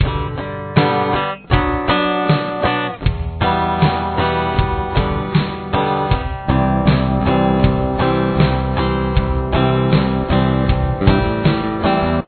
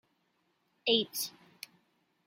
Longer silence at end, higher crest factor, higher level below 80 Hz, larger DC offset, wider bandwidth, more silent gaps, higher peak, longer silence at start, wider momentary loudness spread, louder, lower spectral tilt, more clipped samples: second, 0.05 s vs 0.95 s; second, 16 dB vs 24 dB; first, -26 dBFS vs -86 dBFS; neither; second, 4.5 kHz vs 16.5 kHz; neither; first, 0 dBFS vs -14 dBFS; second, 0 s vs 0.85 s; second, 4 LU vs 21 LU; first, -17 LUFS vs -32 LUFS; first, -10.5 dB/octave vs -2 dB/octave; neither